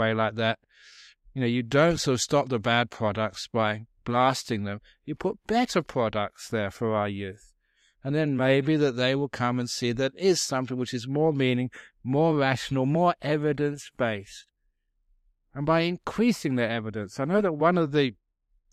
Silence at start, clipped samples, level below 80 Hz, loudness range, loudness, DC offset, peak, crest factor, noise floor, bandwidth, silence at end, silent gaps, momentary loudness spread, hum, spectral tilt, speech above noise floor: 0 s; under 0.1%; -58 dBFS; 4 LU; -26 LUFS; under 0.1%; -8 dBFS; 18 dB; -74 dBFS; 15 kHz; 0.6 s; none; 9 LU; none; -5.5 dB/octave; 48 dB